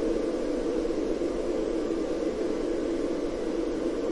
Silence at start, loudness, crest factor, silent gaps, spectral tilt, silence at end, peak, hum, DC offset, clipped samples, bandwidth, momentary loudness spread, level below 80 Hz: 0 s; -30 LUFS; 12 dB; none; -6 dB/octave; 0 s; -16 dBFS; none; under 0.1%; under 0.1%; 11.5 kHz; 1 LU; -44 dBFS